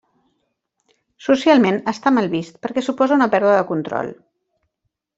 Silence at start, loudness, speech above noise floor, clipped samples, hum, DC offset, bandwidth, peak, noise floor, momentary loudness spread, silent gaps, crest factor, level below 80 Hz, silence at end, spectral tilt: 1.25 s; -18 LUFS; 59 dB; under 0.1%; none; under 0.1%; 8 kHz; -2 dBFS; -76 dBFS; 11 LU; none; 18 dB; -64 dBFS; 1.05 s; -6 dB/octave